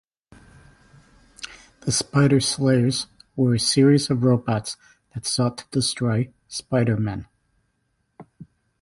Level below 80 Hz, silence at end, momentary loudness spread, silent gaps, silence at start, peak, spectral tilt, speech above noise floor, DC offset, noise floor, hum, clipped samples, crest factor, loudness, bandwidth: -52 dBFS; 0.4 s; 18 LU; none; 1.4 s; -6 dBFS; -5 dB/octave; 51 dB; under 0.1%; -71 dBFS; none; under 0.1%; 18 dB; -21 LUFS; 11.5 kHz